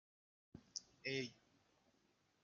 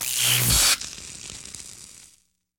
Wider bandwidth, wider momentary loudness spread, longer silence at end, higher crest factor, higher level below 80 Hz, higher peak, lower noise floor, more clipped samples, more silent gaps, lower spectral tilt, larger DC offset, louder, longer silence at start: second, 7.2 kHz vs 19.5 kHz; about the same, 21 LU vs 22 LU; first, 1.1 s vs 0.75 s; first, 26 dB vs 20 dB; second, -84 dBFS vs -40 dBFS; second, -28 dBFS vs -6 dBFS; first, -80 dBFS vs -61 dBFS; neither; neither; first, -3 dB/octave vs -0.5 dB/octave; neither; second, -48 LUFS vs -18 LUFS; first, 0.55 s vs 0 s